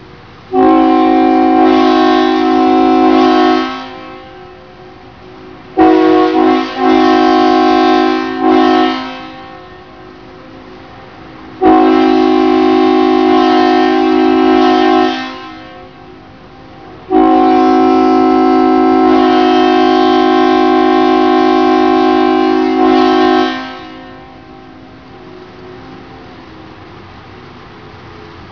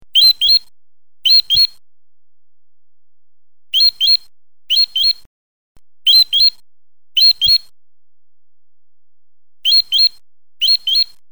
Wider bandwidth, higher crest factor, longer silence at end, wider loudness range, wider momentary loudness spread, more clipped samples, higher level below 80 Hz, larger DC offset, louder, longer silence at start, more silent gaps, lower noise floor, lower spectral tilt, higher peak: second, 5.4 kHz vs over 20 kHz; about the same, 10 dB vs 14 dB; second, 0.05 s vs 0.25 s; about the same, 6 LU vs 4 LU; first, 13 LU vs 9 LU; first, 0.1% vs under 0.1%; first, -44 dBFS vs -52 dBFS; second, 0.4% vs 1%; about the same, -9 LUFS vs -11 LUFS; second, 0 s vs 0.15 s; second, none vs 5.26-5.75 s; second, -35 dBFS vs under -90 dBFS; first, -5.5 dB/octave vs 2 dB/octave; about the same, 0 dBFS vs -2 dBFS